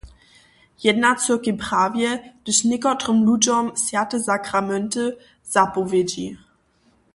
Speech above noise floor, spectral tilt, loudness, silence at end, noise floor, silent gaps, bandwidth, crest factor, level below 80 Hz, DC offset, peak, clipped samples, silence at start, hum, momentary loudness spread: 40 dB; -3 dB/octave; -20 LUFS; 0.8 s; -61 dBFS; none; 11.5 kHz; 18 dB; -56 dBFS; under 0.1%; -2 dBFS; under 0.1%; 0.05 s; none; 8 LU